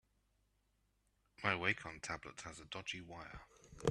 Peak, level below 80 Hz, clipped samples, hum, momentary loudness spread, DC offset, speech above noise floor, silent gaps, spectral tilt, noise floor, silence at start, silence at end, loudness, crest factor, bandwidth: -18 dBFS; -68 dBFS; under 0.1%; 50 Hz at -70 dBFS; 17 LU; under 0.1%; 36 dB; none; -4 dB/octave; -79 dBFS; 1.4 s; 0 s; -42 LUFS; 28 dB; 12.5 kHz